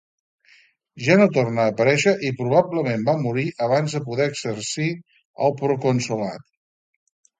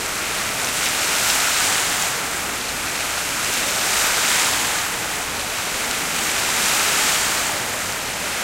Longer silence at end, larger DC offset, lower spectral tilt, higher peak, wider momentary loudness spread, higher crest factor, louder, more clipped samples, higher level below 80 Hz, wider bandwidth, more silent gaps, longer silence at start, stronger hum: first, 1 s vs 0 s; neither; first, -5.5 dB/octave vs 0 dB/octave; about the same, -2 dBFS vs 0 dBFS; first, 10 LU vs 7 LU; about the same, 20 dB vs 22 dB; about the same, -21 LUFS vs -19 LUFS; neither; second, -62 dBFS vs -46 dBFS; second, 9.4 kHz vs 16 kHz; first, 5.25-5.34 s vs none; first, 0.95 s vs 0 s; neither